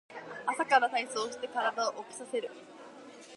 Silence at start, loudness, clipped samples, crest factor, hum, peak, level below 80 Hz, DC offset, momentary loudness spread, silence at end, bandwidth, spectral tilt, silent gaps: 0.1 s; -32 LUFS; under 0.1%; 24 dB; none; -10 dBFS; -84 dBFS; under 0.1%; 23 LU; 0 s; 11.5 kHz; -1.5 dB/octave; none